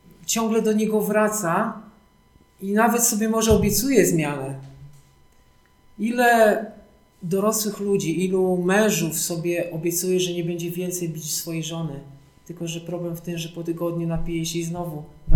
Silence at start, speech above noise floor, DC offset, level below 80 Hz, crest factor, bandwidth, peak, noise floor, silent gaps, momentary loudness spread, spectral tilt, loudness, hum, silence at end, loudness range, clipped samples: 0.2 s; 34 dB; under 0.1%; -44 dBFS; 18 dB; 19 kHz; -4 dBFS; -56 dBFS; none; 13 LU; -4.5 dB/octave; -22 LUFS; none; 0 s; 8 LU; under 0.1%